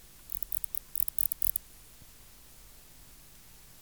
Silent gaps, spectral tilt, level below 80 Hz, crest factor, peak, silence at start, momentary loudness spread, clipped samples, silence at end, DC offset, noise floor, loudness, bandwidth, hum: none; -1 dB/octave; -58 dBFS; 28 dB; -10 dBFS; 0.25 s; 25 LU; under 0.1%; 0.3 s; 0.1%; -55 dBFS; -30 LUFS; over 20 kHz; none